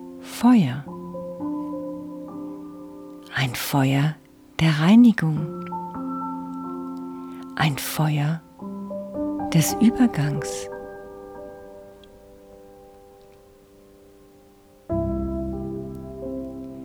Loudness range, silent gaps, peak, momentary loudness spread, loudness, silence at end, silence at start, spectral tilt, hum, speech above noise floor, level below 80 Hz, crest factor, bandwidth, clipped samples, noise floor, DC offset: 13 LU; none; -6 dBFS; 21 LU; -23 LUFS; 0 s; 0 s; -6 dB/octave; none; 33 dB; -46 dBFS; 18 dB; over 20 kHz; under 0.1%; -52 dBFS; under 0.1%